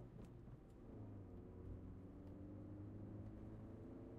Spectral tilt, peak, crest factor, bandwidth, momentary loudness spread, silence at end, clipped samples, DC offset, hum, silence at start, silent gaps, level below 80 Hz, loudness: -10 dB/octave; -42 dBFS; 14 dB; 7 kHz; 5 LU; 0 s; under 0.1%; under 0.1%; none; 0 s; none; -64 dBFS; -57 LUFS